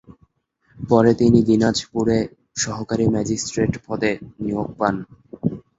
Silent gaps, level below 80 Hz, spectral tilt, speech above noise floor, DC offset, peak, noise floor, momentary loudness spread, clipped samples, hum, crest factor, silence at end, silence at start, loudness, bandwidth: none; -46 dBFS; -5.5 dB/octave; 44 dB; under 0.1%; -2 dBFS; -63 dBFS; 12 LU; under 0.1%; none; 18 dB; 0.2 s; 0.1 s; -20 LUFS; 8 kHz